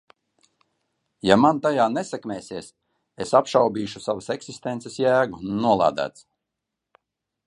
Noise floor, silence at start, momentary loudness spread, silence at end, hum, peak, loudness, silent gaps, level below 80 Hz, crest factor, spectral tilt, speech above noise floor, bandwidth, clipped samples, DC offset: -83 dBFS; 1.25 s; 14 LU; 1.35 s; none; 0 dBFS; -22 LUFS; none; -60 dBFS; 24 dB; -5.5 dB/octave; 61 dB; 11 kHz; under 0.1%; under 0.1%